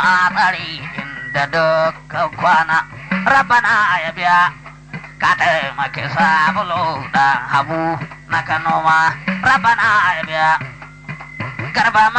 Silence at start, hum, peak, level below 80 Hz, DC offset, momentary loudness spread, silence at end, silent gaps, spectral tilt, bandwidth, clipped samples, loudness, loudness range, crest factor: 0 s; none; -4 dBFS; -48 dBFS; under 0.1%; 14 LU; 0 s; none; -4.5 dB/octave; 9 kHz; under 0.1%; -15 LUFS; 2 LU; 12 dB